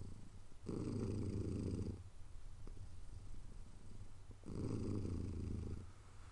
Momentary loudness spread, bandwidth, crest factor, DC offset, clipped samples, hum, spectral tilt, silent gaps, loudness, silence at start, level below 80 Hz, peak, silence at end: 16 LU; 11 kHz; 16 dB; under 0.1%; under 0.1%; none; -8 dB/octave; none; -47 LUFS; 0 s; -54 dBFS; -30 dBFS; 0 s